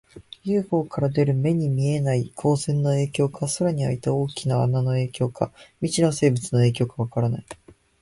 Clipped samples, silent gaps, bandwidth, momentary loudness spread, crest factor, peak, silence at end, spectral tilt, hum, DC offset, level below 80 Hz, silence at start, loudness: under 0.1%; none; 11.5 kHz; 6 LU; 16 dB; -6 dBFS; 0.5 s; -6.5 dB/octave; none; under 0.1%; -54 dBFS; 0.15 s; -23 LUFS